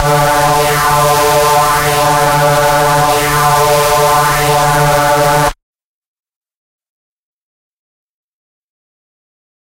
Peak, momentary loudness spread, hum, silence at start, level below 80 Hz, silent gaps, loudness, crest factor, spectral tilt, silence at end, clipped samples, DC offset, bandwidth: 0 dBFS; 1 LU; none; 0 s; -32 dBFS; none; -10 LUFS; 12 dB; -3.5 dB/octave; 4.15 s; under 0.1%; under 0.1%; 16 kHz